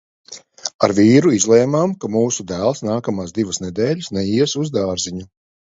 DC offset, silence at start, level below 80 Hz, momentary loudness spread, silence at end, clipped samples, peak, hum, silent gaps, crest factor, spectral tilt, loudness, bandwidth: under 0.1%; 0.3 s; -50 dBFS; 15 LU; 0.4 s; under 0.1%; 0 dBFS; none; 0.74-0.79 s; 18 dB; -5 dB/octave; -17 LUFS; 8 kHz